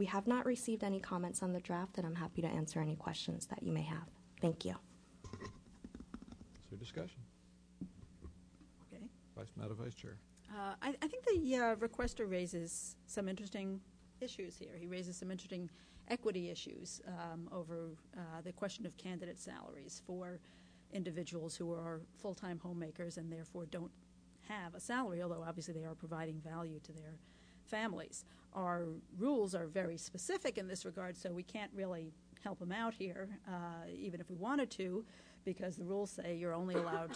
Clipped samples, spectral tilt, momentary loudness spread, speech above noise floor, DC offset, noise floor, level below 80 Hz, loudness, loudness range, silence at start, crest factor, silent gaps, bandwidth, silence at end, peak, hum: under 0.1%; -5 dB/octave; 16 LU; 22 dB; under 0.1%; -65 dBFS; -66 dBFS; -43 LUFS; 9 LU; 0 s; 18 dB; none; 11 kHz; 0 s; -24 dBFS; none